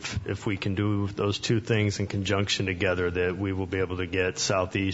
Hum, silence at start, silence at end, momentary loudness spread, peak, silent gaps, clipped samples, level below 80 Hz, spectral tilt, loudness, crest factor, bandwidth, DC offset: none; 0 s; 0 s; 4 LU; -10 dBFS; none; under 0.1%; -54 dBFS; -5 dB/octave; -27 LUFS; 16 dB; 8 kHz; under 0.1%